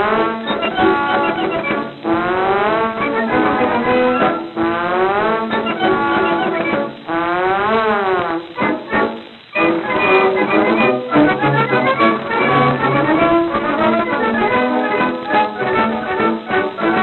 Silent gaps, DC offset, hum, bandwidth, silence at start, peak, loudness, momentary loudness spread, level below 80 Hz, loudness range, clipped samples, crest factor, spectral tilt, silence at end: none; under 0.1%; none; 4.3 kHz; 0 s; 0 dBFS; -16 LUFS; 6 LU; -50 dBFS; 3 LU; under 0.1%; 16 dB; -8.5 dB/octave; 0 s